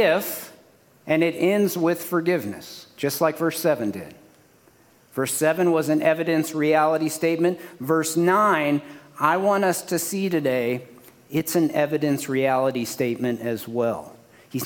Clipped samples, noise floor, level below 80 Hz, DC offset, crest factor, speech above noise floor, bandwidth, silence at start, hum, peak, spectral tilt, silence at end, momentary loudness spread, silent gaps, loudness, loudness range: under 0.1%; -56 dBFS; -68 dBFS; under 0.1%; 18 dB; 34 dB; 18 kHz; 0 s; none; -4 dBFS; -5 dB/octave; 0 s; 11 LU; none; -22 LUFS; 4 LU